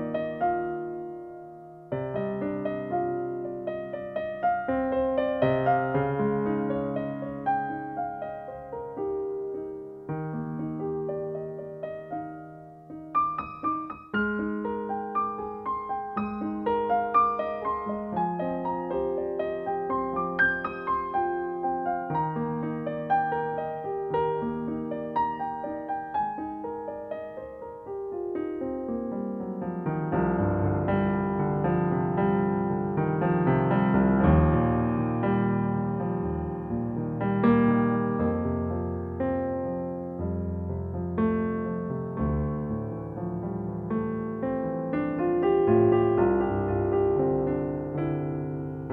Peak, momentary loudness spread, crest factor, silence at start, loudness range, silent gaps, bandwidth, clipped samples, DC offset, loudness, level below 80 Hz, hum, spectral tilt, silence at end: -8 dBFS; 11 LU; 18 dB; 0 s; 9 LU; none; 4.3 kHz; under 0.1%; under 0.1%; -28 LUFS; -46 dBFS; none; -11 dB/octave; 0 s